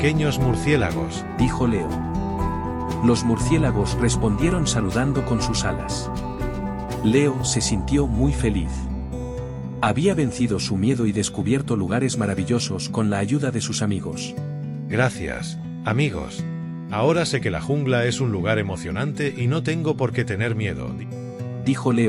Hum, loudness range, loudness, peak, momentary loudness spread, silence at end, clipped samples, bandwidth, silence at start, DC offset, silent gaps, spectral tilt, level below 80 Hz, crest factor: none; 3 LU; -23 LUFS; -6 dBFS; 10 LU; 0 s; under 0.1%; 12 kHz; 0 s; under 0.1%; none; -5.5 dB/octave; -34 dBFS; 16 dB